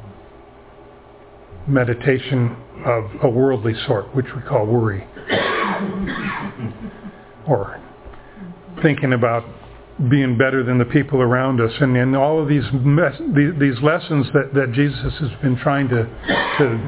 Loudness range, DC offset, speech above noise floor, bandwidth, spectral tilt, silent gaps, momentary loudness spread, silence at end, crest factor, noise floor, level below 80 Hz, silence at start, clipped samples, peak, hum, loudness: 6 LU; under 0.1%; 26 dB; 4 kHz; -11 dB/octave; none; 14 LU; 0 s; 18 dB; -43 dBFS; -44 dBFS; 0 s; under 0.1%; 0 dBFS; none; -19 LUFS